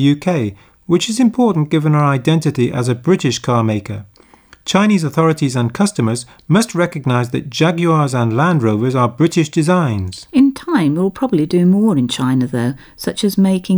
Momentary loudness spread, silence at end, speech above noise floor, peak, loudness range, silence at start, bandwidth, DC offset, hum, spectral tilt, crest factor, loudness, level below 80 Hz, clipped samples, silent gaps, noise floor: 6 LU; 0 s; 32 dB; -2 dBFS; 2 LU; 0 s; over 20 kHz; under 0.1%; none; -6.5 dB/octave; 12 dB; -15 LUFS; -52 dBFS; under 0.1%; none; -46 dBFS